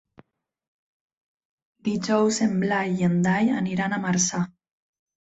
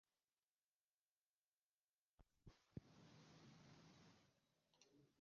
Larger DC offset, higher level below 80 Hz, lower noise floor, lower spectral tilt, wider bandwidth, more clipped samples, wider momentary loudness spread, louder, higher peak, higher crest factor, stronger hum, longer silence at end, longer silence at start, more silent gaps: neither; first, -62 dBFS vs -82 dBFS; second, -57 dBFS vs under -90 dBFS; about the same, -5 dB/octave vs -5.5 dB/octave; first, 8.2 kHz vs 7 kHz; neither; about the same, 8 LU vs 6 LU; first, -24 LUFS vs -66 LUFS; first, -8 dBFS vs -42 dBFS; second, 18 dB vs 28 dB; neither; first, 0.7 s vs 0 s; second, 1.85 s vs 2.2 s; neither